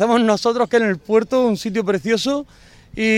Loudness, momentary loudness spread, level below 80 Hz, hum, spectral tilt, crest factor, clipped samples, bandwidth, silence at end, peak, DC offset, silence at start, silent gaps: -18 LUFS; 6 LU; -52 dBFS; none; -5 dB/octave; 16 dB; under 0.1%; 15 kHz; 0 s; -2 dBFS; under 0.1%; 0 s; none